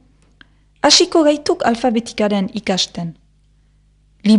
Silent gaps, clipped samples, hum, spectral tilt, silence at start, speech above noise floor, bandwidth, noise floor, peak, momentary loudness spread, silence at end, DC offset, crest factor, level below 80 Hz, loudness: none; under 0.1%; 50 Hz at -40 dBFS; -3.5 dB/octave; 0.85 s; 38 dB; 11 kHz; -54 dBFS; 0 dBFS; 11 LU; 0 s; under 0.1%; 18 dB; -52 dBFS; -15 LUFS